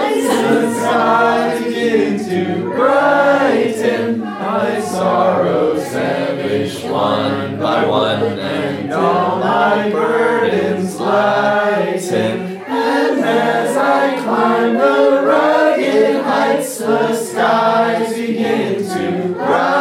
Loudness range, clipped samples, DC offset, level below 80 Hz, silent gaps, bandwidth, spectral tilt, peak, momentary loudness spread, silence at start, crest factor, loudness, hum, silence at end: 3 LU; under 0.1%; under 0.1%; -68 dBFS; none; 16.5 kHz; -5 dB/octave; 0 dBFS; 6 LU; 0 s; 14 dB; -15 LUFS; none; 0 s